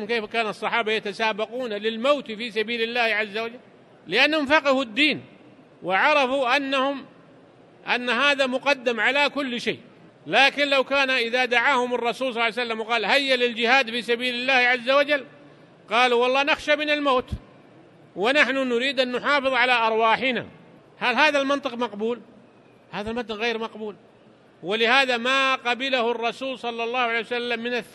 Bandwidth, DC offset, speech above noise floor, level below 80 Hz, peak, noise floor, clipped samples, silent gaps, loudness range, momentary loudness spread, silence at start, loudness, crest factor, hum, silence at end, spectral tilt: 12.5 kHz; under 0.1%; 30 dB; -56 dBFS; -2 dBFS; -53 dBFS; under 0.1%; none; 4 LU; 11 LU; 0 s; -22 LUFS; 22 dB; none; 0.05 s; -3 dB/octave